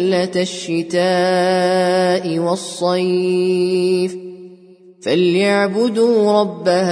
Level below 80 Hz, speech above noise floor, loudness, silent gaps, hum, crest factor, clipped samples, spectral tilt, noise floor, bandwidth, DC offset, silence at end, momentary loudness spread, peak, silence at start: -66 dBFS; 28 dB; -16 LUFS; none; none; 14 dB; under 0.1%; -5.5 dB/octave; -44 dBFS; 10.5 kHz; under 0.1%; 0 s; 6 LU; -4 dBFS; 0 s